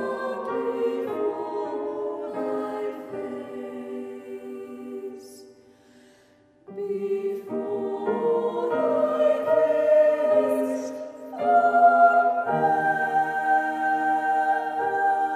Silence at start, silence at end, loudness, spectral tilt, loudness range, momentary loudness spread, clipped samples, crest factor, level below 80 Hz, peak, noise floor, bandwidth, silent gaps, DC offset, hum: 0 s; 0 s; -24 LUFS; -6 dB/octave; 16 LU; 17 LU; under 0.1%; 18 dB; -76 dBFS; -6 dBFS; -58 dBFS; 14.5 kHz; none; under 0.1%; none